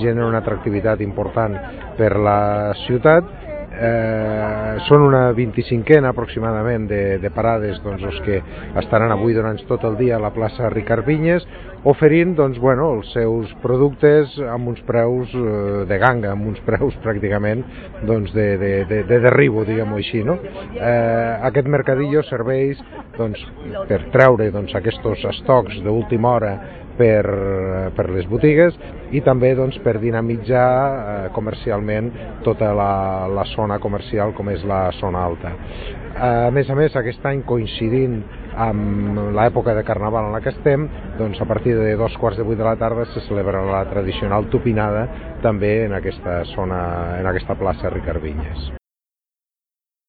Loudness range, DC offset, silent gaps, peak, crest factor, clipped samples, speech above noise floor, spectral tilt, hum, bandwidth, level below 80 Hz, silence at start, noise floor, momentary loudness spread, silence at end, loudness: 4 LU; under 0.1%; none; 0 dBFS; 18 dB; under 0.1%; over 72 dB; -10.5 dB/octave; none; 4.8 kHz; -36 dBFS; 0 s; under -90 dBFS; 11 LU; 1.3 s; -18 LUFS